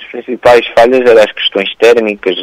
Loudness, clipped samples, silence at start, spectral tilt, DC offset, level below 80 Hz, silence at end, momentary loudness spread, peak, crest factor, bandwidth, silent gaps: -8 LUFS; 0.8%; 0 s; -4 dB/octave; under 0.1%; -44 dBFS; 0 s; 6 LU; 0 dBFS; 8 dB; 14.5 kHz; none